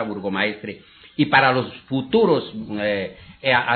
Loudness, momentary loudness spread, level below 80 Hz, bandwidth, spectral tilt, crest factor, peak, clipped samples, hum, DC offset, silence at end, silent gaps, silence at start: -21 LUFS; 17 LU; -56 dBFS; 4.6 kHz; -3 dB/octave; 20 dB; -2 dBFS; under 0.1%; none; under 0.1%; 0 s; none; 0 s